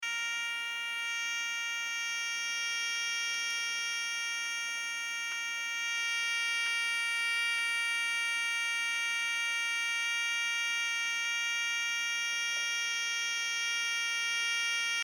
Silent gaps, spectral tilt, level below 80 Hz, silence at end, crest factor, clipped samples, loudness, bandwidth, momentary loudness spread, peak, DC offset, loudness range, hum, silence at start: none; 4.5 dB/octave; under -90 dBFS; 0 s; 12 dB; under 0.1%; -31 LUFS; 17 kHz; 4 LU; -22 dBFS; under 0.1%; 3 LU; none; 0 s